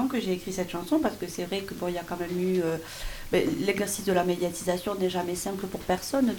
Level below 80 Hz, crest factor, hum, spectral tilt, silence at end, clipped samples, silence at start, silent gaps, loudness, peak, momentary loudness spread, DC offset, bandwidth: -48 dBFS; 18 dB; none; -5 dB/octave; 0 s; under 0.1%; 0 s; none; -29 LUFS; -10 dBFS; 7 LU; under 0.1%; 18 kHz